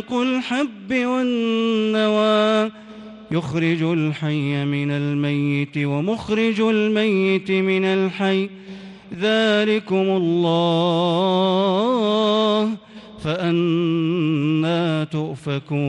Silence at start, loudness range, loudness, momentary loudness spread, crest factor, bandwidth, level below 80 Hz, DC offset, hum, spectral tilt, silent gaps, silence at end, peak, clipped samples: 0 s; 3 LU; -20 LUFS; 8 LU; 14 dB; 10 kHz; -60 dBFS; under 0.1%; none; -7 dB/octave; none; 0 s; -6 dBFS; under 0.1%